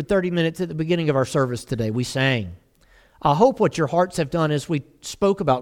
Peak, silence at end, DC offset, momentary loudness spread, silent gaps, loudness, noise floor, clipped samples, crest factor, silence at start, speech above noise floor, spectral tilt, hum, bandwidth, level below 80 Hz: -4 dBFS; 0 s; under 0.1%; 9 LU; none; -22 LUFS; -55 dBFS; under 0.1%; 18 dB; 0 s; 34 dB; -6 dB/octave; none; 16 kHz; -50 dBFS